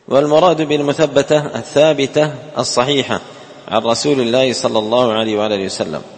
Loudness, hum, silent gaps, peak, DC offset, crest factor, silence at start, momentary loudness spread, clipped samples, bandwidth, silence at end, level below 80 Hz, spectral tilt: -15 LUFS; none; none; 0 dBFS; under 0.1%; 14 dB; 0.1 s; 8 LU; under 0.1%; 8.8 kHz; 0 s; -54 dBFS; -4.5 dB/octave